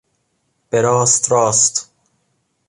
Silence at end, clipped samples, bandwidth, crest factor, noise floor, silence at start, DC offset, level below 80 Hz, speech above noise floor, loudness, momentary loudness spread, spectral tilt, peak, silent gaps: 0.85 s; under 0.1%; 11.5 kHz; 18 dB; -67 dBFS; 0.75 s; under 0.1%; -60 dBFS; 52 dB; -14 LUFS; 8 LU; -3 dB/octave; 0 dBFS; none